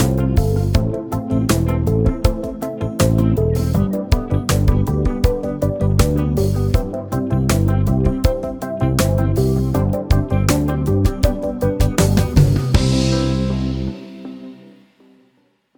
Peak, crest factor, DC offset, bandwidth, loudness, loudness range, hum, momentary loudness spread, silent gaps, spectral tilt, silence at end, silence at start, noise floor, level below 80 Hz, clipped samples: 0 dBFS; 16 dB; under 0.1%; over 20 kHz; -18 LUFS; 1 LU; none; 8 LU; none; -6.5 dB/octave; 1.25 s; 0 s; -60 dBFS; -24 dBFS; under 0.1%